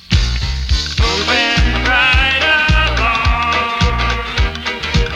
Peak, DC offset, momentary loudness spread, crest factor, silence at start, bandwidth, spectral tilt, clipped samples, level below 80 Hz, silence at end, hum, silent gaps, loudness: 0 dBFS; under 0.1%; 7 LU; 14 dB; 0.1 s; 10 kHz; -4 dB/octave; under 0.1%; -18 dBFS; 0 s; none; none; -14 LUFS